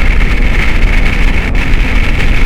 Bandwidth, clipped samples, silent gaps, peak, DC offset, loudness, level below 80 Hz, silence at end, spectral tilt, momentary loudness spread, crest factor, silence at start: 9.4 kHz; 1%; none; 0 dBFS; under 0.1%; -13 LUFS; -8 dBFS; 0 s; -5.5 dB/octave; 1 LU; 8 dB; 0 s